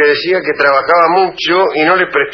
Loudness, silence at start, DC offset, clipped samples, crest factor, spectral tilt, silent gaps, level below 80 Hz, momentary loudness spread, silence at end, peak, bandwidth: -11 LUFS; 0 s; under 0.1%; under 0.1%; 12 dB; -4.5 dB/octave; none; -52 dBFS; 3 LU; 0 s; 0 dBFS; 6.2 kHz